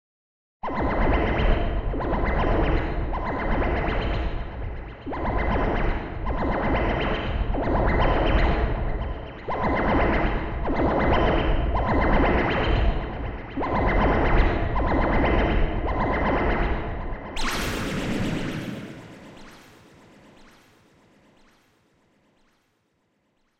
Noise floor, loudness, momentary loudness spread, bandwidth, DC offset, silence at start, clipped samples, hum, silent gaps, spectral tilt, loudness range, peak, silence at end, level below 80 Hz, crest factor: -70 dBFS; -25 LUFS; 12 LU; 13 kHz; under 0.1%; 0.65 s; under 0.1%; none; none; -6.5 dB/octave; 7 LU; -6 dBFS; 4 s; -28 dBFS; 16 dB